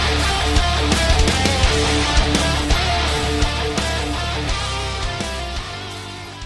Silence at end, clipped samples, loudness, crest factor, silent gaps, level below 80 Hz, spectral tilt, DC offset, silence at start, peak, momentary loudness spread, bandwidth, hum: 0 s; under 0.1%; -19 LUFS; 18 dB; none; -24 dBFS; -4 dB/octave; under 0.1%; 0 s; -2 dBFS; 10 LU; 12 kHz; none